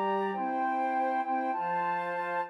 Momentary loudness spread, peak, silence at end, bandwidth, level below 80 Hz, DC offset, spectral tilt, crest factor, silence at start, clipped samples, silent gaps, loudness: 2 LU; -18 dBFS; 0 s; 11 kHz; under -90 dBFS; under 0.1%; -7 dB/octave; 12 dB; 0 s; under 0.1%; none; -31 LUFS